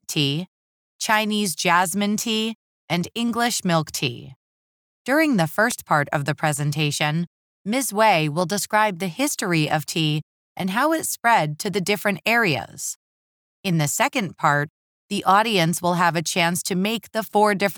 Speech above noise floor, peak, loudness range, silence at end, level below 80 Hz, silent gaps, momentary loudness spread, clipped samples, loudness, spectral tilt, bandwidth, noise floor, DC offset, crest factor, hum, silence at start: over 69 dB; -4 dBFS; 2 LU; 0 s; -66 dBFS; 0.48-0.99 s, 2.55-2.88 s, 4.36-5.05 s, 7.27-7.65 s, 10.23-10.56 s, 12.96-13.63 s, 14.70-15.09 s; 10 LU; under 0.1%; -21 LUFS; -4 dB/octave; over 20 kHz; under -90 dBFS; under 0.1%; 18 dB; none; 0.1 s